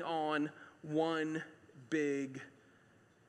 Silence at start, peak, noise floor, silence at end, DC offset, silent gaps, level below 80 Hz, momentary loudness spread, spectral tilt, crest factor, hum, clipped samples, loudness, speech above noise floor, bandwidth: 0 s; -22 dBFS; -67 dBFS; 0.8 s; under 0.1%; none; -88 dBFS; 17 LU; -5.5 dB/octave; 18 dB; none; under 0.1%; -38 LUFS; 30 dB; 9.8 kHz